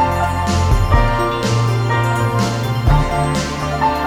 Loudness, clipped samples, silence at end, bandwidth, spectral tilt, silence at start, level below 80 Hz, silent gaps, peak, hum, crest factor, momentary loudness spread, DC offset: -17 LUFS; under 0.1%; 0 s; 16.5 kHz; -6 dB/octave; 0 s; -22 dBFS; none; -2 dBFS; none; 14 dB; 3 LU; under 0.1%